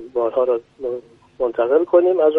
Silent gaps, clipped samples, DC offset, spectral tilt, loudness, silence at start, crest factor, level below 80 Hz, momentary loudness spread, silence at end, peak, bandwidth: none; under 0.1%; under 0.1%; -7.5 dB/octave; -19 LUFS; 0 s; 16 dB; -60 dBFS; 13 LU; 0 s; -2 dBFS; 3.9 kHz